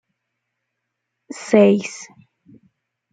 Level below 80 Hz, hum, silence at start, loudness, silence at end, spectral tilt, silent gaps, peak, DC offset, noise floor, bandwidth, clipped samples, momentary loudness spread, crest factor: -66 dBFS; none; 1.35 s; -16 LUFS; 1.1 s; -6 dB/octave; none; -2 dBFS; under 0.1%; -78 dBFS; 9.2 kHz; under 0.1%; 23 LU; 20 dB